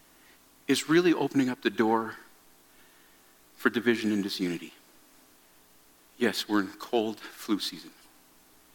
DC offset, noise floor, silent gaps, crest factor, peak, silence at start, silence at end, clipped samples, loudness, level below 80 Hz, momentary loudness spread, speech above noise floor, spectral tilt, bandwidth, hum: under 0.1%; -59 dBFS; none; 22 dB; -8 dBFS; 0.7 s; 0.85 s; under 0.1%; -28 LUFS; -74 dBFS; 15 LU; 32 dB; -4.5 dB/octave; 17.5 kHz; none